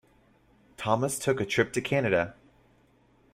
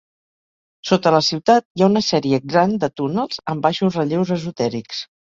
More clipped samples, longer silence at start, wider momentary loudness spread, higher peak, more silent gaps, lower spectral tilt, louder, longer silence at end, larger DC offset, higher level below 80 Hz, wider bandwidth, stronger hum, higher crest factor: neither; about the same, 0.8 s vs 0.85 s; second, 6 LU vs 9 LU; second, -8 dBFS vs -2 dBFS; second, none vs 1.65-1.75 s; about the same, -4.5 dB/octave vs -5.5 dB/octave; second, -28 LUFS vs -18 LUFS; first, 1 s vs 0.25 s; neither; about the same, -62 dBFS vs -58 dBFS; first, 16 kHz vs 7.6 kHz; neither; about the same, 22 dB vs 18 dB